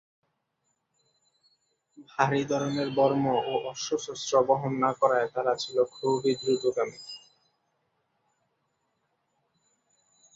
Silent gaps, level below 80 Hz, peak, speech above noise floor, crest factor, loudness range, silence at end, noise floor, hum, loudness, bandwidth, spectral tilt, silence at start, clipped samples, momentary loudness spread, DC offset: none; -72 dBFS; -8 dBFS; 51 dB; 22 dB; 6 LU; 3.2 s; -78 dBFS; none; -27 LUFS; 8 kHz; -5 dB/octave; 2 s; under 0.1%; 8 LU; under 0.1%